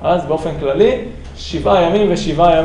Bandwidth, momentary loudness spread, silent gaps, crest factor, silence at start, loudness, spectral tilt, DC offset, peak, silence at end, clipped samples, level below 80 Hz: 10.5 kHz; 12 LU; none; 14 dB; 0 s; -15 LUFS; -6 dB/octave; under 0.1%; 0 dBFS; 0 s; under 0.1%; -32 dBFS